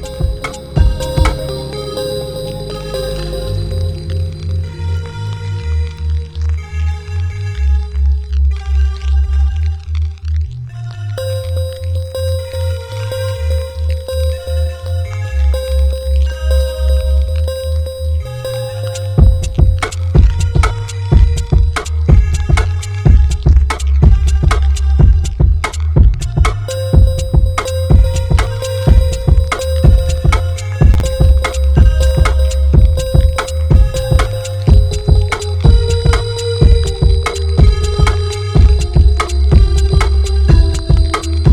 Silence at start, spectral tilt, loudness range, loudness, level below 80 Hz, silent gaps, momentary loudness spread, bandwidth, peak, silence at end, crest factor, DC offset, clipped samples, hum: 0 s; -6.5 dB/octave; 7 LU; -14 LUFS; -14 dBFS; none; 9 LU; 13.5 kHz; 0 dBFS; 0 s; 12 dB; under 0.1%; 0.4%; none